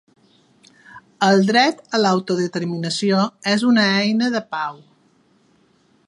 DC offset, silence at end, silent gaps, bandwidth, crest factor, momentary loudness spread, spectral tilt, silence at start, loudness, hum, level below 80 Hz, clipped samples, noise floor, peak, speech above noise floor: under 0.1%; 1.35 s; none; 11.5 kHz; 18 dB; 9 LU; -5 dB/octave; 0.95 s; -18 LUFS; none; -70 dBFS; under 0.1%; -58 dBFS; -2 dBFS; 40 dB